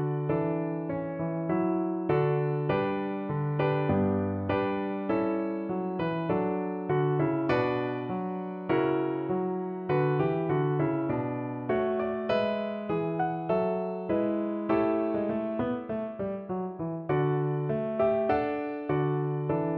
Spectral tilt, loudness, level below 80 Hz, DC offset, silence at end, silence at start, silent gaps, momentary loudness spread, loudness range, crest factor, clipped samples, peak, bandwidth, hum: -10.5 dB/octave; -29 LUFS; -60 dBFS; under 0.1%; 0 s; 0 s; none; 6 LU; 2 LU; 16 dB; under 0.1%; -14 dBFS; 5.4 kHz; none